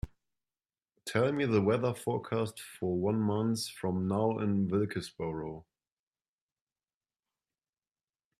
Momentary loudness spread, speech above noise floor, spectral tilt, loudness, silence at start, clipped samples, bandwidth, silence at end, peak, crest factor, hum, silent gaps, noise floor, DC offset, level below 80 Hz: 10 LU; over 59 dB; -6.5 dB/octave; -32 LUFS; 0.05 s; under 0.1%; 14.5 kHz; 2.8 s; -12 dBFS; 22 dB; none; none; under -90 dBFS; under 0.1%; -60 dBFS